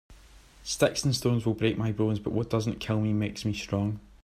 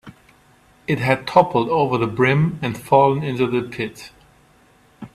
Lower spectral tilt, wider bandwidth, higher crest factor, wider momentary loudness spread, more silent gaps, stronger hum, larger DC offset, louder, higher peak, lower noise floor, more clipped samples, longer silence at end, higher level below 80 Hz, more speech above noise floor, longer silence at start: second, -5.5 dB/octave vs -7 dB/octave; about the same, 15 kHz vs 14.5 kHz; about the same, 20 dB vs 20 dB; second, 6 LU vs 12 LU; neither; neither; neither; second, -28 LUFS vs -19 LUFS; second, -10 dBFS vs 0 dBFS; about the same, -53 dBFS vs -54 dBFS; neither; first, 0.25 s vs 0.1 s; about the same, -52 dBFS vs -54 dBFS; second, 26 dB vs 36 dB; about the same, 0.1 s vs 0.05 s